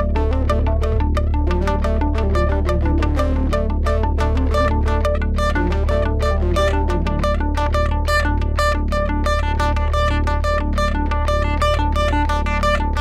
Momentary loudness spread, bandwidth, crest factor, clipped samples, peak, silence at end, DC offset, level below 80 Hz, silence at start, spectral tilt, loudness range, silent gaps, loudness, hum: 2 LU; 10.5 kHz; 10 dB; under 0.1%; -6 dBFS; 0 s; under 0.1%; -20 dBFS; 0 s; -6.5 dB/octave; 0 LU; none; -19 LUFS; none